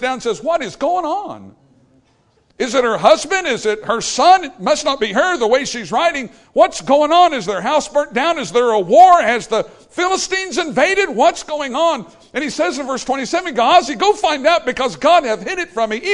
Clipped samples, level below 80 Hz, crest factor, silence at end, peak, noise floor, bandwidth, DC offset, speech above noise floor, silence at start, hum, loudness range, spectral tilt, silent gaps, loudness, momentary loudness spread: under 0.1%; -52 dBFS; 16 dB; 0 s; 0 dBFS; -57 dBFS; 11 kHz; under 0.1%; 42 dB; 0 s; none; 4 LU; -2.5 dB/octave; none; -15 LUFS; 10 LU